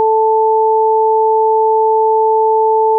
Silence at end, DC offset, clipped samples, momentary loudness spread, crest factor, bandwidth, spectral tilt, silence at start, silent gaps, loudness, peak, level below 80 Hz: 0 s; under 0.1%; under 0.1%; 0 LU; 4 dB; 1 kHz; -2 dB/octave; 0 s; none; -12 LUFS; -6 dBFS; under -90 dBFS